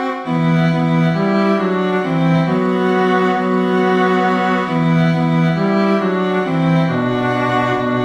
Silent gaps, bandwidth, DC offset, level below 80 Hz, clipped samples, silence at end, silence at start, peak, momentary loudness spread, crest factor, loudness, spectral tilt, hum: none; 7.8 kHz; under 0.1%; -50 dBFS; under 0.1%; 0 s; 0 s; -4 dBFS; 3 LU; 12 dB; -15 LUFS; -8 dB/octave; none